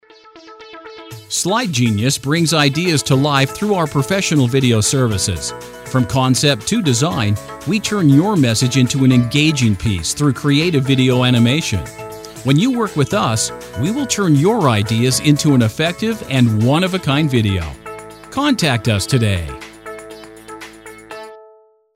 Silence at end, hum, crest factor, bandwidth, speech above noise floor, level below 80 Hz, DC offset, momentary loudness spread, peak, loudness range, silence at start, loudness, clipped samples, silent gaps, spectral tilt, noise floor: 0.55 s; none; 16 dB; 16 kHz; 34 dB; -42 dBFS; under 0.1%; 19 LU; 0 dBFS; 4 LU; 0.35 s; -15 LUFS; under 0.1%; none; -5 dB/octave; -49 dBFS